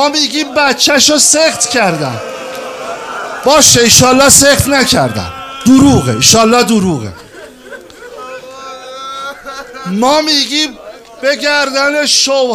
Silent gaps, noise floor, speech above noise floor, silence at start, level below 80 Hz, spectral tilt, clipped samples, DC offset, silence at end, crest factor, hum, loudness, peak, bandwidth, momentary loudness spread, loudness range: none; -32 dBFS; 23 dB; 0 s; -38 dBFS; -2.5 dB/octave; 0.6%; under 0.1%; 0 s; 10 dB; none; -8 LUFS; 0 dBFS; over 20 kHz; 21 LU; 9 LU